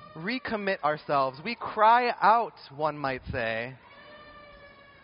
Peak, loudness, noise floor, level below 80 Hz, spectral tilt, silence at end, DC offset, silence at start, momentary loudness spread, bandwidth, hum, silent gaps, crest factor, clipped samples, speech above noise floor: -8 dBFS; -27 LUFS; -52 dBFS; -58 dBFS; -2.5 dB/octave; 0.35 s; under 0.1%; 0 s; 12 LU; 5.4 kHz; none; none; 20 dB; under 0.1%; 25 dB